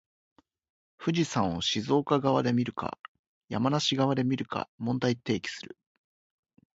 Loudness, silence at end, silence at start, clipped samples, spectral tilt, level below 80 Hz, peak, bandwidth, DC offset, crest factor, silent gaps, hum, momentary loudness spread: -29 LUFS; 1.1 s; 1 s; under 0.1%; -5.5 dB/octave; -62 dBFS; -10 dBFS; 8 kHz; under 0.1%; 20 dB; 2.99-3.48 s, 4.68-4.78 s; none; 12 LU